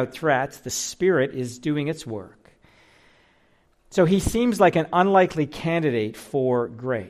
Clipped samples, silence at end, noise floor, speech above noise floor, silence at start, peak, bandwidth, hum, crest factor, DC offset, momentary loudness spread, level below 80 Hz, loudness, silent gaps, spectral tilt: under 0.1%; 0 s; -61 dBFS; 39 dB; 0 s; -6 dBFS; 15 kHz; none; 18 dB; under 0.1%; 10 LU; -46 dBFS; -22 LUFS; none; -5.5 dB/octave